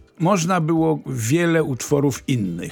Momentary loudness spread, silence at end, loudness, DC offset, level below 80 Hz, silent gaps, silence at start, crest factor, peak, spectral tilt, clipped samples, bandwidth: 5 LU; 0 s; -20 LUFS; under 0.1%; -52 dBFS; none; 0.2 s; 16 dB; -4 dBFS; -6 dB/octave; under 0.1%; 18.5 kHz